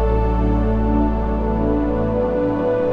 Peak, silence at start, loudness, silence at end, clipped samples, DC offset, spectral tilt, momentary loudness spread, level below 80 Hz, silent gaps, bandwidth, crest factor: -6 dBFS; 0 s; -19 LUFS; 0 s; under 0.1%; under 0.1%; -10.5 dB/octave; 2 LU; -22 dBFS; none; 4.7 kHz; 12 dB